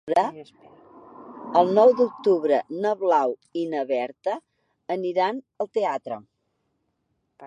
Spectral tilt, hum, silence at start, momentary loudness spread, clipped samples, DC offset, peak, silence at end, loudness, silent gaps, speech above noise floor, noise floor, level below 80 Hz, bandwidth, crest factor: -6.5 dB/octave; none; 0.05 s; 16 LU; under 0.1%; under 0.1%; -4 dBFS; 0 s; -23 LUFS; none; 51 dB; -74 dBFS; -78 dBFS; 10 kHz; 20 dB